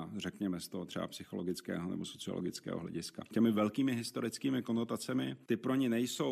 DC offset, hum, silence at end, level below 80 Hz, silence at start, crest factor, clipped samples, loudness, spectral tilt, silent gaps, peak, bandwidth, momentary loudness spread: under 0.1%; none; 0 s; -74 dBFS; 0 s; 18 dB; under 0.1%; -37 LUFS; -5.5 dB/octave; none; -18 dBFS; 14.5 kHz; 9 LU